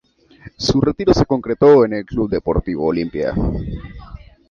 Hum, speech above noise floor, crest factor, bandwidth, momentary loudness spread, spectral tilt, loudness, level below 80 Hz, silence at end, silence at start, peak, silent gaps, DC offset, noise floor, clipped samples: none; 27 dB; 16 dB; 7.4 kHz; 16 LU; -7 dB/octave; -17 LUFS; -32 dBFS; 0.35 s; 0.45 s; -2 dBFS; none; under 0.1%; -43 dBFS; under 0.1%